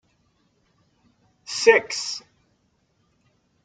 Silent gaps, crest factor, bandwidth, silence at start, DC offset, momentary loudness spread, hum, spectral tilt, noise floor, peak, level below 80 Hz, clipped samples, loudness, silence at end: none; 24 dB; 9.4 kHz; 1.5 s; under 0.1%; 18 LU; none; -0.5 dB/octave; -67 dBFS; -2 dBFS; -72 dBFS; under 0.1%; -21 LUFS; 1.45 s